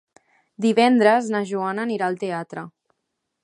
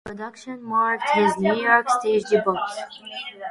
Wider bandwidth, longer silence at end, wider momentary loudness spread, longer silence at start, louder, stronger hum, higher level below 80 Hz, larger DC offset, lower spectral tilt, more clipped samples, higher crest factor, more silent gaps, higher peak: about the same, 11 kHz vs 11.5 kHz; first, 0.75 s vs 0 s; about the same, 17 LU vs 16 LU; first, 0.6 s vs 0.05 s; about the same, -21 LUFS vs -21 LUFS; neither; second, -76 dBFS vs -64 dBFS; neither; about the same, -5.5 dB/octave vs -4.5 dB/octave; neither; about the same, 20 dB vs 18 dB; neither; about the same, -4 dBFS vs -4 dBFS